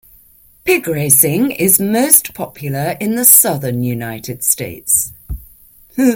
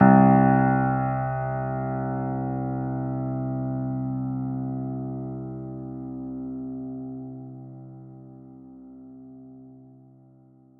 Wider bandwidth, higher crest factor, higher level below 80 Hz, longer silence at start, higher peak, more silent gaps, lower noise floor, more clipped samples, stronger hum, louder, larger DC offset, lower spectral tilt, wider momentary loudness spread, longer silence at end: first, over 20 kHz vs 2.9 kHz; second, 16 dB vs 22 dB; first, -40 dBFS vs -52 dBFS; first, 0.65 s vs 0 s; first, 0 dBFS vs -4 dBFS; neither; second, -47 dBFS vs -54 dBFS; first, 0.3% vs under 0.1%; neither; first, -12 LUFS vs -26 LUFS; neither; second, -3.5 dB/octave vs -13.5 dB/octave; second, 17 LU vs 25 LU; second, 0 s vs 0.9 s